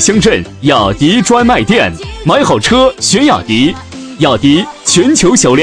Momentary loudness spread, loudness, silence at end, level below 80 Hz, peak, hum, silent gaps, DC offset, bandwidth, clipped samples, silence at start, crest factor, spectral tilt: 6 LU; -9 LUFS; 0 s; -32 dBFS; 0 dBFS; none; none; 0.2%; 10.5 kHz; 0.2%; 0 s; 10 dB; -4 dB/octave